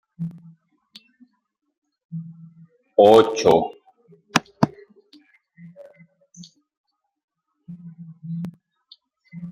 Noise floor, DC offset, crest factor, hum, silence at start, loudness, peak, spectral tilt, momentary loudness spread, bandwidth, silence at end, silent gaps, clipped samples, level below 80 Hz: -73 dBFS; under 0.1%; 24 dB; none; 0.2 s; -19 LUFS; 0 dBFS; -5.5 dB/octave; 28 LU; 15.5 kHz; 0 s; 1.78-1.82 s, 2.04-2.09 s, 6.77-6.84 s, 7.24-7.28 s; under 0.1%; -62 dBFS